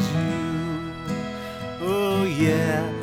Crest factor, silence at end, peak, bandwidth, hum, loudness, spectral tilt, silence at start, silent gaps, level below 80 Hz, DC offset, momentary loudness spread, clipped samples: 16 dB; 0 s; -10 dBFS; 17.5 kHz; none; -25 LUFS; -6.5 dB/octave; 0 s; none; -50 dBFS; under 0.1%; 10 LU; under 0.1%